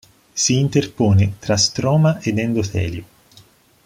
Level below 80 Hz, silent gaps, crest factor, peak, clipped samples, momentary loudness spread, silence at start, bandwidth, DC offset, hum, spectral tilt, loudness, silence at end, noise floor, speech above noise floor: -48 dBFS; none; 16 dB; -4 dBFS; under 0.1%; 9 LU; 0.35 s; 14.5 kHz; under 0.1%; none; -5 dB/octave; -18 LUFS; 0.8 s; -50 dBFS; 33 dB